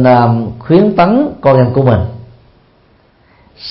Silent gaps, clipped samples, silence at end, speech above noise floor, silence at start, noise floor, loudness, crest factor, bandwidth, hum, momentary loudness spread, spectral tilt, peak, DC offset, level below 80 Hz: none; under 0.1%; 0 s; 40 dB; 0 s; -49 dBFS; -10 LUFS; 12 dB; 5.8 kHz; none; 9 LU; -11.5 dB/octave; 0 dBFS; under 0.1%; -38 dBFS